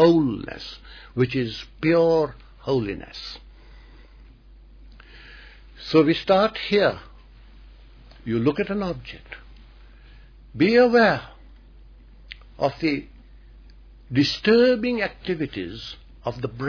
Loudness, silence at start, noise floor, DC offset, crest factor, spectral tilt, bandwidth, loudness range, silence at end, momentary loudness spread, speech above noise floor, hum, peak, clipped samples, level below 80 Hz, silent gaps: -22 LUFS; 0 s; -48 dBFS; under 0.1%; 20 dB; -7 dB/octave; 5.4 kHz; 7 LU; 0 s; 22 LU; 26 dB; none; -4 dBFS; under 0.1%; -48 dBFS; none